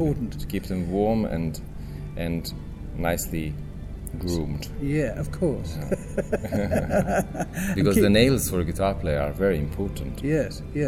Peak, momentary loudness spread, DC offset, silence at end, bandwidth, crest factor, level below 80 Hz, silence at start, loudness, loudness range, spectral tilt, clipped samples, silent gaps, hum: -6 dBFS; 13 LU; under 0.1%; 0 s; 16 kHz; 20 dB; -36 dBFS; 0 s; -26 LUFS; 7 LU; -6 dB/octave; under 0.1%; none; none